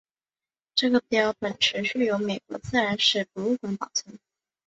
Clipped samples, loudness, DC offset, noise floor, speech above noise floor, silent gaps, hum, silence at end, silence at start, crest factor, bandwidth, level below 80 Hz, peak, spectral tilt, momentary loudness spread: under 0.1%; -25 LUFS; under 0.1%; under -90 dBFS; over 64 dB; none; none; 0.5 s; 0.75 s; 20 dB; 8.2 kHz; -60 dBFS; -6 dBFS; -3 dB/octave; 8 LU